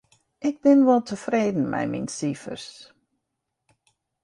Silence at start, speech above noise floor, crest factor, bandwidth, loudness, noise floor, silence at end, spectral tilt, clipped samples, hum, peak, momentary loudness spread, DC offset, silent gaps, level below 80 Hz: 0.4 s; 58 dB; 18 dB; 11 kHz; -23 LUFS; -81 dBFS; 1.4 s; -6 dB/octave; under 0.1%; none; -6 dBFS; 17 LU; under 0.1%; none; -66 dBFS